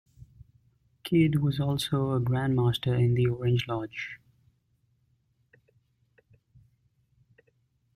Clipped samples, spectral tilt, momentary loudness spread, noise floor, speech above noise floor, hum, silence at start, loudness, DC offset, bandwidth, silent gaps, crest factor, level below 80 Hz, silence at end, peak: under 0.1%; -7 dB/octave; 13 LU; -71 dBFS; 45 dB; none; 1.05 s; -27 LUFS; under 0.1%; 14 kHz; none; 18 dB; -56 dBFS; 3.8 s; -12 dBFS